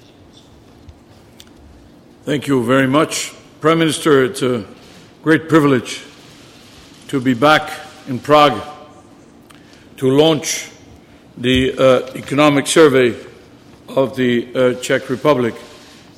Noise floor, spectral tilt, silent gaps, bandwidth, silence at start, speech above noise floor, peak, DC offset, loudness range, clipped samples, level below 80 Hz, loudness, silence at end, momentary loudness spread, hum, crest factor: -44 dBFS; -4.5 dB/octave; none; 16 kHz; 0.9 s; 30 dB; 0 dBFS; under 0.1%; 4 LU; under 0.1%; -46 dBFS; -15 LUFS; 0.5 s; 16 LU; none; 16 dB